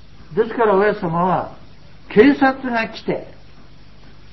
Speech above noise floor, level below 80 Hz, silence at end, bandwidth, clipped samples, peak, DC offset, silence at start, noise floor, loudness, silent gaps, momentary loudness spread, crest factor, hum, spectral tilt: 29 dB; -48 dBFS; 1.1 s; 6 kHz; under 0.1%; 0 dBFS; 1%; 0.3 s; -45 dBFS; -18 LUFS; none; 13 LU; 20 dB; none; -8 dB/octave